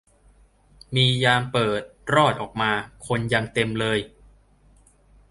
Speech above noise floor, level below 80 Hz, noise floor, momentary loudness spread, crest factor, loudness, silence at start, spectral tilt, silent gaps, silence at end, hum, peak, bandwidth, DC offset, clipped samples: 34 dB; -52 dBFS; -56 dBFS; 9 LU; 22 dB; -22 LUFS; 0.9 s; -5 dB/octave; none; 1.25 s; none; -4 dBFS; 11.5 kHz; under 0.1%; under 0.1%